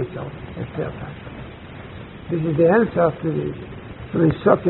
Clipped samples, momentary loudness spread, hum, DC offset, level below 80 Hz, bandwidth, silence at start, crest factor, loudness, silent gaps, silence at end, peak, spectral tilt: under 0.1%; 21 LU; none; under 0.1%; -46 dBFS; 4.1 kHz; 0 s; 20 dB; -21 LUFS; none; 0 s; 0 dBFS; -7.5 dB/octave